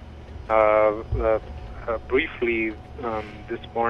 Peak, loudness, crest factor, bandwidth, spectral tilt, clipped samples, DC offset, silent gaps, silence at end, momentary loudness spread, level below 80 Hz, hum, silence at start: -6 dBFS; -24 LUFS; 18 dB; 6.4 kHz; -8 dB/octave; under 0.1%; under 0.1%; none; 0 s; 16 LU; -38 dBFS; none; 0 s